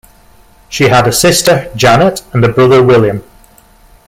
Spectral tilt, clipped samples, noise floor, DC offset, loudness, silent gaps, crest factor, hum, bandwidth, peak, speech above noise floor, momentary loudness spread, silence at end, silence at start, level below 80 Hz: -4.5 dB/octave; under 0.1%; -42 dBFS; under 0.1%; -8 LUFS; none; 10 dB; none; 16.5 kHz; 0 dBFS; 34 dB; 7 LU; 0.85 s; 0.7 s; -38 dBFS